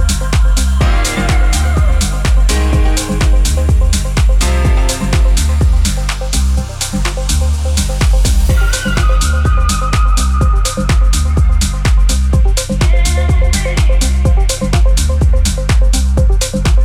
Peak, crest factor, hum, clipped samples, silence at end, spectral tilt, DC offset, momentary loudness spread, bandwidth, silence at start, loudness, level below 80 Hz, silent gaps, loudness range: 0 dBFS; 10 dB; none; under 0.1%; 0 s; -4.5 dB/octave; under 0.1%; 2 LU; 14 kHz; 0 s; -13 LUFS; -10 dBFS; none; 1 LU